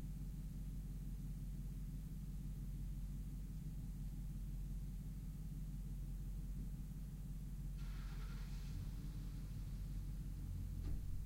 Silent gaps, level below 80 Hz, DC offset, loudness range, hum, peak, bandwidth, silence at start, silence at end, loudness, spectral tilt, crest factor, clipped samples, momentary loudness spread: none; -48 dBFS; under 0.1%; 1 LU; none; -34 dBFS; 16 kHz; 0 s; 0 s; -50 LUFS; -7 dB/octave; 12 dB; under 0.1%; 2 LU